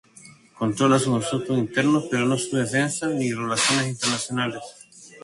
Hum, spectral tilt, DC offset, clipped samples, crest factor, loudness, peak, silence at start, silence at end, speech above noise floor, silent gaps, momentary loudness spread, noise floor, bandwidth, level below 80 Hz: none; -4 dB/octave; under 0.1%; under 0.1%; 18 dB; -23 LUFS; -6 dBFS; 0.25 s; 0.05 s; 27 dB; none; 8 LU; -49 dBFS; 11.5 kHz; -62 dBFS